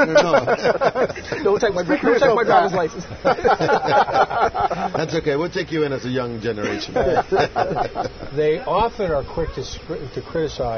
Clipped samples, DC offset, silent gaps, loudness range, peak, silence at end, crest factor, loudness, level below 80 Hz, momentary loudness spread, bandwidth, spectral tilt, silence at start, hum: under 0.1%; under 0.1%; none; 4 LU; -2 dBFS; 0 s; 18 dB; -20 LUFS; -42 dBFS; 10 LU; 6.6 kHz; -5.5 dB/octave; 0 s; none